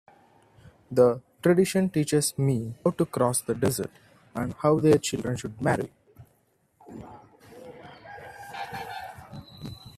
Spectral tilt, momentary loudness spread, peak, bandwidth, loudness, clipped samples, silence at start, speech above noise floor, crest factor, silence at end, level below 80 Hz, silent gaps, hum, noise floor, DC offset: -5.5 dB/octave; 23 LU; -6 dBFS; 15.5 kHz; -25 LUFS; under 0.1%; 0.9 s; 43 dB; 20 dB; 0.05 s; -60 dBFS; none; none; -68 dBFS; under 0.1%